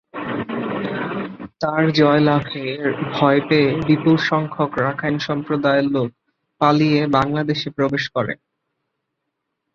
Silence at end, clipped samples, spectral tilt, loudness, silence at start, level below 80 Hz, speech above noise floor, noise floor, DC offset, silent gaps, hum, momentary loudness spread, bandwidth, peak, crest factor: 1.4 s; under 0.1%; -7.5 dB/octave; -19 LUFS; 0.15 s; -54 dBFS; 59 dB; -77 dBFS; under 0.1%; none; none; 11 LU; 6.8 kHz; -2 dBFS; 18 dB